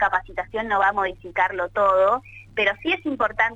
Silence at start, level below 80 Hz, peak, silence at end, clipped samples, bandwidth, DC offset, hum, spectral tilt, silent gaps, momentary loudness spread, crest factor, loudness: 0 s; -50 dBFS; -6 dBFS; 0 s; under 0.1%; 7.8 kHz; under 0.1%; none; -5 dB/octave; none; 8 LU; 16 dB; -22 LUFS